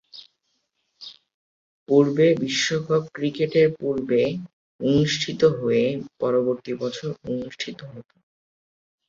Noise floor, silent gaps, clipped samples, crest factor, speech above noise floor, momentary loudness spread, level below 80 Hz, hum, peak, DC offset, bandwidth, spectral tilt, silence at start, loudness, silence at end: -73 dBFS; 1.34-1.86 s, 4.53-4.79 s; under 0.1%; 20 dB; 51 dB; 15 LU; -60 dBFS; none; -4 dBFS; under 0.1%; 7.8 kHz; -5.5 dB/octave; 0.15 s; -22 LUFS; 1.05 s